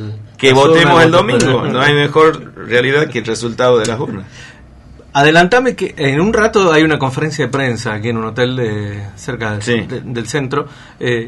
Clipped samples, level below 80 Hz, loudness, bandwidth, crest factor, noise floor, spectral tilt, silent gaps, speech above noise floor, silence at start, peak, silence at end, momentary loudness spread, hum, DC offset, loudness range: under 0.1%; -42 dBFS; -13 LUFS; 11.5 kHz; 14 dB; -38 dBFS; -5 dB/octave; none; 25 dB; 0 s; 0 dBFS; 0 s; 14 LU; none; under 0.1%; 7 LU